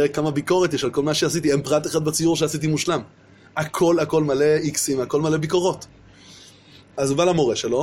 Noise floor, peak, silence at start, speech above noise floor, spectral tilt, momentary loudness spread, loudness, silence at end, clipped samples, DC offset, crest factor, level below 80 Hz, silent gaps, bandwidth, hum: -48 dBFS; -6 dBFS; 0 s; 28 dB; -4.5 dB/octave; 7 LU; -21 LUFS; 0 s; under 0.1%; under 0.1%; 16 dB; -54 dBFS; none; 16.5 kHz; none